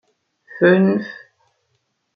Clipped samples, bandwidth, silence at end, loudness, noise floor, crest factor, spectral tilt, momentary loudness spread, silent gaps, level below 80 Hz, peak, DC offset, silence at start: under 0.1%; 5.2 kHz; 1 s; -16 LUFS; -70 dBFS; 18 dB; -9.5 dB/octave; 26 LU; none; -66 dBFS; -2 dBFS; under 0.1%; 0.55 s